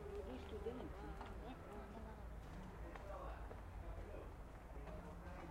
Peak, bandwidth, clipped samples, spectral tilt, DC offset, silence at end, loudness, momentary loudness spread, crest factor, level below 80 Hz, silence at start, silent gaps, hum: -36 dBFS; 16 kHz; under 0.1%; -7 dB/octave; under 0.1%; 0 s; -53 LUFS; 5 LU; 14 dB; -54 dBFS; 0 s; none; none